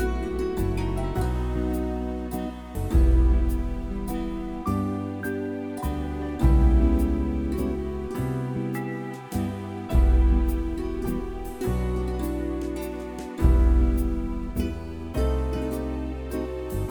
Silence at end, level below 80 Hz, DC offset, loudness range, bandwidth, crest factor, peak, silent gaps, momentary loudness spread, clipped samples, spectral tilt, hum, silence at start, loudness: 0 s; -26 dBFS; under 0.1%; 3 LU; 19 kHz; 18 dB; -6 dBFS; none; 11 LU; under 0.1%; -8 dB/octave; none; 0 s; -27 LUFS